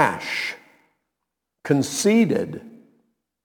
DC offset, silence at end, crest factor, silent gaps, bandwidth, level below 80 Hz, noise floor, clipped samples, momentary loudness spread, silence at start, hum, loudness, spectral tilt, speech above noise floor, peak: under 0.1%; 0.7 s; 24 dB; none; 19 kHz; -68 dBFS; -82 dBFS; under 0.1%; 21 LU; 0 s; none; -22 LUFS; -4.5 dB/octave; 61 dB; -2 dBFS